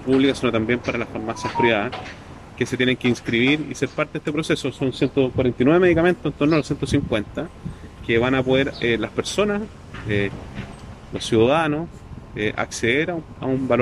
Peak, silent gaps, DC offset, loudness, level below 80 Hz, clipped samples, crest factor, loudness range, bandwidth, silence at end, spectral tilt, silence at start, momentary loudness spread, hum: -4 dBFS; none; under 0.1%; -21 LUFS; -44 dBFS; under 0.1%; 16 dB; 3 LU; 12.5 kHz; 0 s; -5.5 dB/octave; 0 s; 17 LU; none